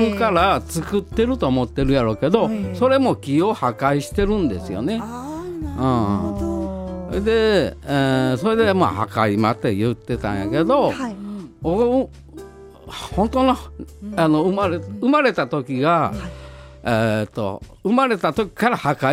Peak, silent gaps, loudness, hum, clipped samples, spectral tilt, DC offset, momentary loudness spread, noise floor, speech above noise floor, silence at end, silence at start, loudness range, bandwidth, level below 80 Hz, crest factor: 0 dBFS; none; -20 LUFS; none; under 0.1%; -6.5 dB/octave; under 0.1%; 12 LU; -39 dBFS; 20 dB; 0 s; 0 s; 3 LU; 16 kHz; -38 dBFS; 18 dB